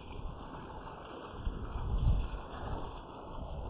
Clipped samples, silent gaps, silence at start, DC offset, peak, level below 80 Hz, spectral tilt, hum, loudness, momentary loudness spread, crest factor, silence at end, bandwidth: under 0.1%; none; 0 s; under 0.1%; -20 dBFS; -40 dBFS; -6.5 dB/octave; none; -41 LUFS; 13 LU; 18 dB; 0 s; 4 kHz